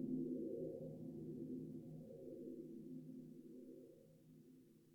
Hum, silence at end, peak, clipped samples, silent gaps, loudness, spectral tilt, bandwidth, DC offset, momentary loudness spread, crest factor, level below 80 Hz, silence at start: none; 0 s; -34 dBFS; under 0.1%; none; -52 LUFS; -10 dB/octave; 18.5 kHz; under 0.1%; 19 LU; 16 dB; -84 dBFS; 0 s